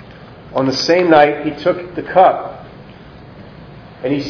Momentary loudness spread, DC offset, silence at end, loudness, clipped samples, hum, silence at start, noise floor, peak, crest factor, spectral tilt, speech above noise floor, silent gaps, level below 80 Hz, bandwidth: 14 LU; under 0.1%; 0 s; -14 LUFS; under 0.1%; none; 0 s; -37 dBFS; 0 dBFS; 16 dB; -5.5 dB/octave; 24 dB; none; -48 dBFS; 5.4 kHz